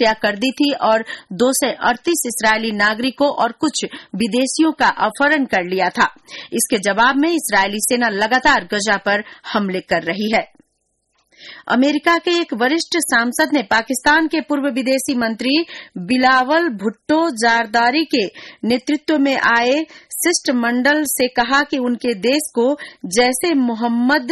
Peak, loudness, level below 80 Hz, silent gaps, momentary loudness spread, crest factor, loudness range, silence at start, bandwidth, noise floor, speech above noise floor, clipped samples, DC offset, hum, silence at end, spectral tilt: -4 dBFS; -17 LUFS; -52 dBFS; none; 6 LU; 14 dB; 2 LU; 0 s; 12.5 kHz; -68 dBFS; 51 dB; under 0.1%; under 0.1%; none; 0 s; -3 dB/octave